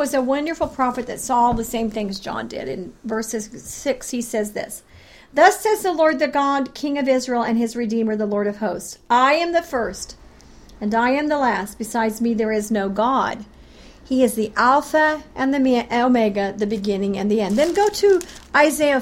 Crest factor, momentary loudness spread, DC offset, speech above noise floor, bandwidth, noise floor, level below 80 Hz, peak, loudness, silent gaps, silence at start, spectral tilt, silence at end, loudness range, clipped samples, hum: 20 dB; 11 LU; under 0.1%; 25 dB; 16.5 kHz; -45 dBFS; -48 dBFS; -2 dBFS; -20 LUFS; none; 0 s; -4.5 dB/octave; 0 s; 5 LU; under 0.1%; none